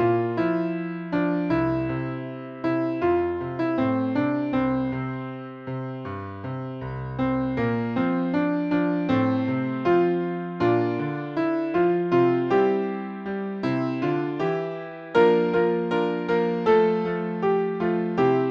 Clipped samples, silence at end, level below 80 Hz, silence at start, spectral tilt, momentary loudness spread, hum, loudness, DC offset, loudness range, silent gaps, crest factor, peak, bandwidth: under 0.1%; 0 s; -54 dBFS; 0 s; -9 dB/octave; 12 LU; none; -24 LUFS; under 0.1%; 5 LU; none; 18 dB; -6 dBFS; 6.2 kHz